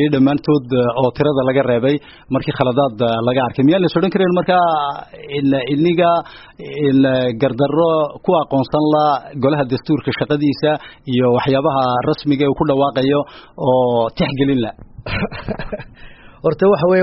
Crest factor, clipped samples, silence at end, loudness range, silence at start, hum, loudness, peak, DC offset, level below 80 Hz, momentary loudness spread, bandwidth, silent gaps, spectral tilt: 16 dB; under 0.1%; 0 s; 2 LU; 0 s; none; -16 LUFS; 0 dBFS; under 0.1%; -44 dBFS; 9 LU; 5.8 kHz; none; -5.5 dB/octave